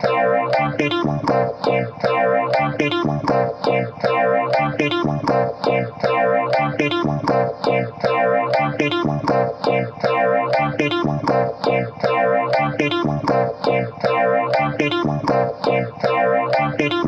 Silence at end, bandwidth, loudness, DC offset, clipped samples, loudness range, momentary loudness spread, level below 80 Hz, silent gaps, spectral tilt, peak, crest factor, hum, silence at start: 0 s; 8.2 kHz; -19 LUFS; under 0.1%; under 0.1%; 1 LU; 3 LU; -50 dBFS; none; -7 dB/octave; -6 dBFS; 14 dB; none; 0 s